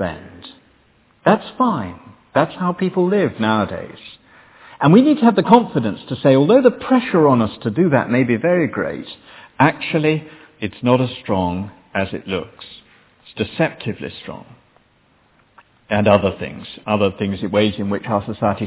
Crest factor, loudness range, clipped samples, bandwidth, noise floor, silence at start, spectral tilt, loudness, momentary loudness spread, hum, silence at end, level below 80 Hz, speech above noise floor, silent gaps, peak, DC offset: 18 dB; 10 LU; under 0.1%; 4 kHz; -57 dBFS; 0 s; -11 dB/octave; -17 LUFS; 18 LU; none; 0 s; -48 dBFS; 40 dB; none; 0 dBFS; under 0.1%